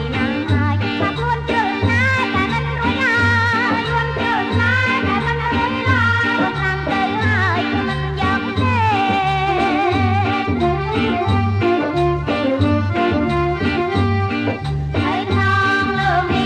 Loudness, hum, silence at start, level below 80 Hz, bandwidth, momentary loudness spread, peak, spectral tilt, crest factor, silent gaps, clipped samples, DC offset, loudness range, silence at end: -17 LUFS; none; 0 s; -34 dBFS; 9 kHz; 4 LU; -4 dBFS; -6.5 dB/octave; 14 dB; none; under 0.1%; under 0.1%; 1 LU; 0 s